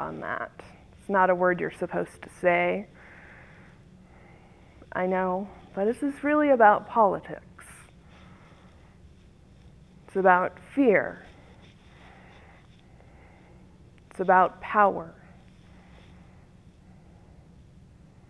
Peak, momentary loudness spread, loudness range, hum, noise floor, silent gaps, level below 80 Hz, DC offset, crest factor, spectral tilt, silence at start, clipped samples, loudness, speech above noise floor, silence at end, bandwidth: -6 dBFS; 24 LU; 7 LU; none; -53 dBFS; none; -58 dBFS; under 0.1%; 22 dB; -7 dB/octave; 0 s; under 0.1%; -25 LUFS; 29 dB; 3.15 s; 11 kHz